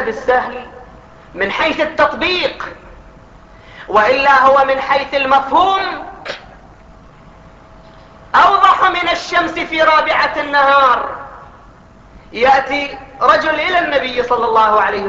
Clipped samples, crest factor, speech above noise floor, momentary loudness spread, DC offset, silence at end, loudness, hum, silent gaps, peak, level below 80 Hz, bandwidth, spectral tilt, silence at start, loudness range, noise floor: under 0.1%; 14 dB; 28 dB; 17 LU; under 0.1%; 0 s; -13 LUFS; none; none; 0 dBFS; -44 dBFS; 8 kHz; -3.5 dB/octave; 0 s; 5 LU; -41 dBFS